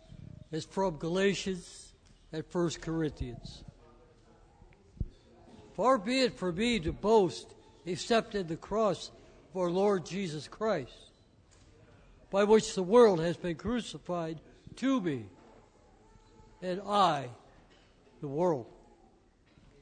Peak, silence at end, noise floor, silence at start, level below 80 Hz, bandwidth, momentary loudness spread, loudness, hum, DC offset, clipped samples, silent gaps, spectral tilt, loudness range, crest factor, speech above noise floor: -12 dBFS; 1.1 s; -64 dBFS; 0.1 s; -54 dBFS; 9.6 kHz; 20 LU; -31 LUFS; none; under 0.1%; under 0.1%; none; -5.5 dB/octave; 8 LU; 20 dB; 34 dB